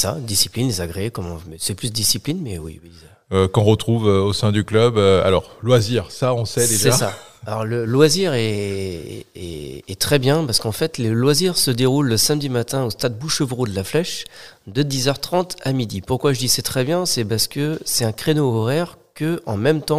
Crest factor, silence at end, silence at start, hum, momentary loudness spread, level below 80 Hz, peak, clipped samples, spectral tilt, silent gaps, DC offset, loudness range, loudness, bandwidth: 20 dB; 0 s; 0 s; none; 13 LU; -48 dBFS; 0 dBFS; under 0.1%; -4.5 dB/octave; none; 0.7%; 5 LU; -19 LUFS; 16 kHz